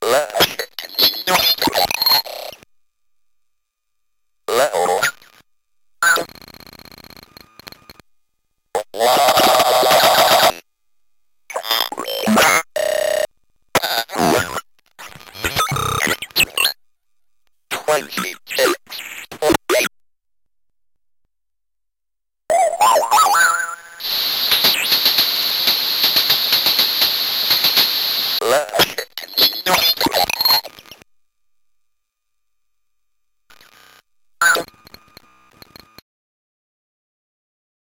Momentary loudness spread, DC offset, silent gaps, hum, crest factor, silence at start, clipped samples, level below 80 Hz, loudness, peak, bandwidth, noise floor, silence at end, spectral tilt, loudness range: 13 LU; under 0.1%; none; none; 18 dB; 0 s; under 0.1%; -52 dBFS; -15 LUFS; -2 dBFS; 17 kHz; -86 dBFS; 3.3 s; -1.5 dB/octave; 10 LU